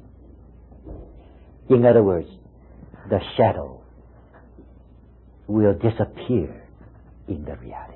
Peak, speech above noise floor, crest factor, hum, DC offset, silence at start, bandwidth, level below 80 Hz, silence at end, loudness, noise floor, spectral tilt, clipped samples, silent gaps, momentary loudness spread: -4 dBFS; 29 dB; 20 dB; none; under 0.1%; 0.85 s; 4.2 kHz; -44 dBFS; 0 s; -21 LUFS; -49 dBFS; -12.5 dB/octave; under 0.1%; none; 26 LU